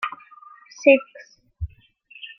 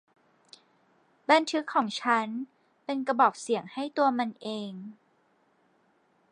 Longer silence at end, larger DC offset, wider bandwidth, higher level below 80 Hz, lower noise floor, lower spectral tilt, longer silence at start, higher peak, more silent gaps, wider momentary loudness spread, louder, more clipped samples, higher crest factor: second, 0.1 s vs 1.4 s; neither; second, 6.4 kHz vs 10.5 kHz; first, -46 dBFS vs -86 dBFS; second, -52 dBFS vs -68 dBFS; first, -5.5 dB/octave vs -4 dB/octave; second, 0 s vs 1.3 s; first, -2 dBFS vs -8 dBFS; neither; first, 25 LU vs 17 LU; first, -19 LUFS vs -28 LUFS; neither; about the same, 22 dB vs 22 dB